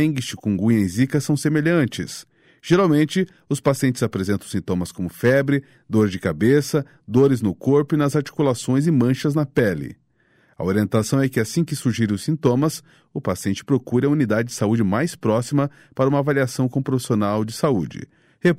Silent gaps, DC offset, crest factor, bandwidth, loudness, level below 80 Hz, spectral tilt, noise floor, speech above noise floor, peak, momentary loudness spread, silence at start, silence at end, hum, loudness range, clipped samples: none; under 0.1%; 14 dB; 16 kHz; -21 LUFS; -54 dBFS; -6.5 dB/octave; -60 dBFS; 40 dB; -6 dBFS; 7 LU; 0 s; 0 s; none; 2 LU; under 0.1%